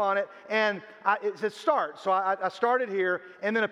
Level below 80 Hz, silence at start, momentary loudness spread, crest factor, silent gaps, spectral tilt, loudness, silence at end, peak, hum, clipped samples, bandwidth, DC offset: -86 dBFS; 0 s; 4 LU; 18 dB; none; -5 dB/octave; -28 LUFS; 0 s; -10 dBFS; none; under 0.1%; 12 kHz; under 0.1%